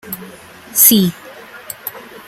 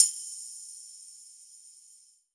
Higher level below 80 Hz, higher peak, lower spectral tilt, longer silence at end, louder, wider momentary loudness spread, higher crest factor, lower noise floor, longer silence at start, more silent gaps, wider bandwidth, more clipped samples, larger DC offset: first, -56 dBFS vs under -90 dBFS; first, 0 dBFS vs -4 dBFS; first, -3 dB/octave vs 7.5 dB/octave; second, 0.25 s vs 0.55 s; first, -10 LUFS vs -32 LUFS; first, 22 LU vs 16 LU; second, 18 dB vs 30 dB; second, -37 dBFS vs -59 dBFS; about the same, 0.05 s vs 0 s; neither; first, 17 kHz vs 11.5 kHz; first, 0.1% vs under 0.1%; neither